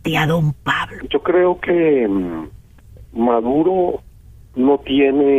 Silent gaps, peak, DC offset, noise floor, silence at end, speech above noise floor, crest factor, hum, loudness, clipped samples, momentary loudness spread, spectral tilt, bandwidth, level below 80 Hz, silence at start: none; -4 dBFS; under 0.1%; -42 dBFS; 0 s; 26 dB; 12 dB; none; -17 LUFS; under 0.1%; 13 LU; -7 dB/octave; 14.5 kHz; -44 dBFS; 0.05 s